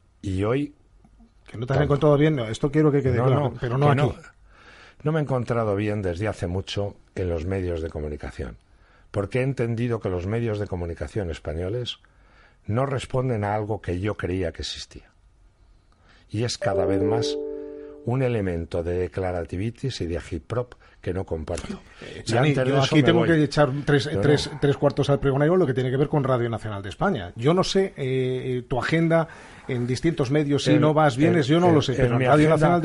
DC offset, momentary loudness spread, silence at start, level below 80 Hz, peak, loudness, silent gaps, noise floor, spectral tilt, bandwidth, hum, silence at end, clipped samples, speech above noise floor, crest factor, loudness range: under 0.1%; 13 LU; 0.25 s; -44 dBFS; -4 dBFS; -24 LUFS; none; -56 dBFS; -6.5 dB/octave; 11.5 kHz; none; 0 s; under 0.1%; 33 dB; 20 dB; 8 LU